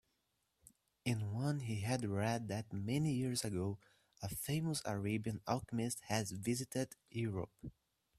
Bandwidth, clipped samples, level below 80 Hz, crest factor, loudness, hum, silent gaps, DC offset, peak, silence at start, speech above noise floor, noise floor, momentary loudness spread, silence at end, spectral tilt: 15.5 kHz; under 0.1%; -68 dBFS; 20 dB; -40 LUFS; none; none; under 0.1%; -20 dBFS; 1.05 s; 44 dB; -83 dBFS; 7 LU; 0.5 s; -5.5 dB/octave